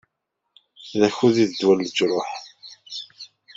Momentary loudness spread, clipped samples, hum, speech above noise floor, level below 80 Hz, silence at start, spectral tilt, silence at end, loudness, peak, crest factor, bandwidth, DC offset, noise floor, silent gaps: 23 LU; under 0.1%; none; 59 dB; -66 dBFS; 0.8 s; -5 dB/octave; 0.3 s; -21 LUFS; -4 dBFS; 20 dB; 7.8 kHz; under 0.1%; -79 dBFS; none